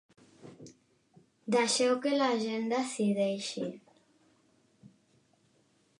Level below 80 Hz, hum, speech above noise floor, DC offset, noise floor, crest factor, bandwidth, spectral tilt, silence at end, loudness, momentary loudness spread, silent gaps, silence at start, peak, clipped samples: -84 dBFS; none; 40 dB; under 0.1%; -70 dBFS; 20 dB; 11.5 kHz; -4 dB/octave; 2.2 s; -30 LUFS; 21 LU; none; 0.45 s; -14 dBFS; under 0.1%